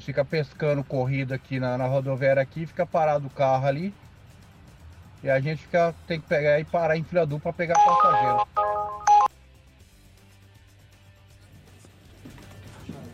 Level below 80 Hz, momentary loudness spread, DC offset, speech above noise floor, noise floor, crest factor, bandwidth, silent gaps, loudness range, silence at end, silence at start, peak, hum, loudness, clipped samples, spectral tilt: -56 dBFS; 12 LU; under 0.1%; 29 dB; -53 dBFS; 18 dB; 13.5 kHz; none; 5 LU; 0 s; 0 s; -8 dBFS; none; -24 LUFS; under 0.1%; -6.5 dB/octave